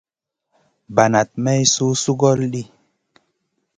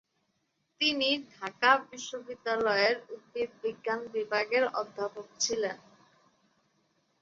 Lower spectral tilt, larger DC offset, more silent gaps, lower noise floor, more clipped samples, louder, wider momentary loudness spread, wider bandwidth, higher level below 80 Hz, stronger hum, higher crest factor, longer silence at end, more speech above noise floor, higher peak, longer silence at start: first, -4.5 dB/octave vs -1.5 dB/octave; neither; neither; about the same, -79 dBFS vs -77 dBFS; neither; first, -17 LUFS vs -30 LUFS; second, 10 LU vs 14 LU; first, 10 kHz vs 7.8 kHz; first, -56 dBFS vs -76 dBFS; neither; about the same, 20 dB vs 24 dB; second, 1.15 s vs 1.45 s; first, 62 dB vs 47 dB; first, 0 dBFS vs -8 dBFS; about the same, 0.9 s vs 0.8 s